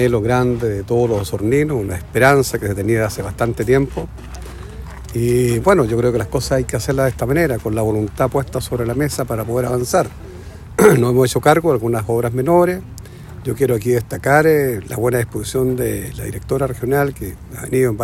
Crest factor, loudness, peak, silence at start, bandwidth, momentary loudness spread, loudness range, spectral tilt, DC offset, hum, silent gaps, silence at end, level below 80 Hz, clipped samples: 16 dB; -17 LUFS; 0 dBFS; 0 s; 16.5 kHz; 15 LU; 3 LU; -6 dB/octave; under 0.1%; none; none; 0 s; -36 dBFS; under 0.1%